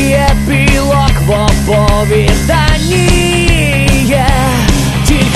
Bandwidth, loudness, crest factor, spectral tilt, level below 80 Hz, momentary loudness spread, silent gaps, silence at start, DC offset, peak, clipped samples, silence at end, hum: 14 kHz; -10 LUFS; 8 dB; -5 dB/octave; -14 dBFS; 1 LU; none; 0 s; 1%; 0 dBFS; under 0.1%; 0 s; none